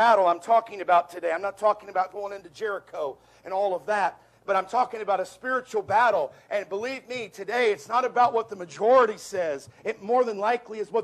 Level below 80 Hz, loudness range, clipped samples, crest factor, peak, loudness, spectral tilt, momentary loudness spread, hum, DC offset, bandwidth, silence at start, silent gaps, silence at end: -72 dBFS; 4 LU; under 0.1%; 18 dB; -8 dBFS; -26 LUFS; -4 dB/octave; 12 LU; none; under 0.1%; 13.5 kHz; 0 s; none; 0 s